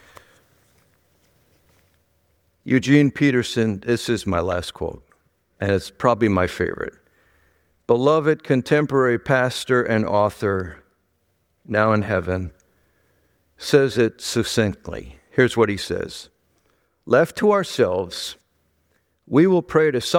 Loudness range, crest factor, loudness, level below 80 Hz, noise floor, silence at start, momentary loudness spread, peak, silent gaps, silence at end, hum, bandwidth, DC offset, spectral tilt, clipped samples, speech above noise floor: 4 LU; 20 dB; -20 LUFS; -50 dBFS; -68 dBFS; 2.65 s; 15 LU; -2 dBFS; none; 0 s; none; 16.5 kHz; under 0.1%; -6 dB/octave; under 0.1%; 48 dB